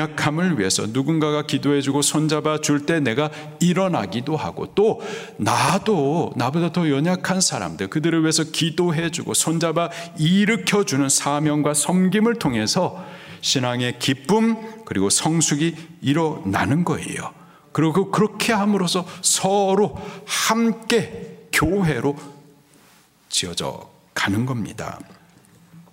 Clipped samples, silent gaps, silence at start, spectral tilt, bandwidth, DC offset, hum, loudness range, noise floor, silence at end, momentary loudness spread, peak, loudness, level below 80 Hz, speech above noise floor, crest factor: under 0.1%; none; 0 s; -4 dB/octave; 16 kHz; under 0.1%; none; 4 LU; -54 dBFS; 0.1 s; 9 LU; -2 dBFS; -20 LUFS; -54 dBFS; 33 dB; 18 dB